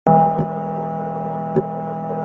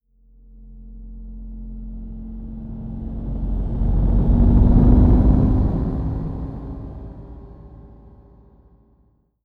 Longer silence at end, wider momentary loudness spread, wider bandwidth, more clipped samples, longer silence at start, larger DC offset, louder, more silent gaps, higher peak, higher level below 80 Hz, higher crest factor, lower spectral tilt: second, 0 s vs 1.6 s; second, 10 LU vs 25 LU; first, 3.5 kHz vs 2.1 kHz; neither; second, 0.05 s vs 0.55 s; neither; about the same, -21 LUFS vs -19 LUFS; neither; about the same, -2 dBFS vs -2 dBFS; second, -54 dBFS vs -22 dBFS; about the same, 18 dB vs 18 dB; about the same, -11 dB/octave vs -12 dB/octave